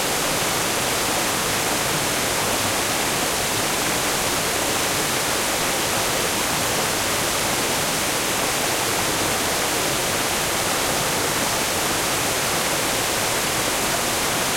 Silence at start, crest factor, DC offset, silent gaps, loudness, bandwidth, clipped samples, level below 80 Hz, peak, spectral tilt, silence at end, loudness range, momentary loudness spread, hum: 0 s; 14 dB; under 0.1%; none; -20 LUFS; 16.5 kHz; under 0.1%; -44 dBFS; -8 dBFS; -1.5 dB/octave; 0 s; 0 LU; 0 LU; none